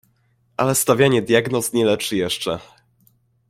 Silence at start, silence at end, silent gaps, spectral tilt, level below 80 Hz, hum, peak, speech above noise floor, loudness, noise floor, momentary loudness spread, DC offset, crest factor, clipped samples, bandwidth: 0.6 s; 0.85 s; none; -4 dB/octave; -56 dBFS; none; -2 dBFS; 44 dB; -19 LUFS; -62 dBFS; 10 LU; under 0.1%; 18 dB; under 0.1%; 16.5 kHz